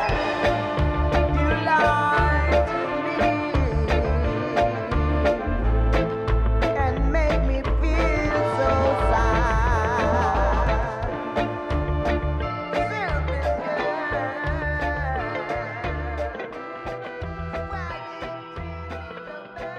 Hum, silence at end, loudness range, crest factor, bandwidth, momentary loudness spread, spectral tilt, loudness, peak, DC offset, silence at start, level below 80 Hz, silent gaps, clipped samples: none; 0 s; 8 LU; 16 dB; 9.4 kHz; 12 LU; -7 dB/octave; -24 LUFS; -8 dBFS; under 0.1%; 0 s; -28 dBFS; none; under 0.1%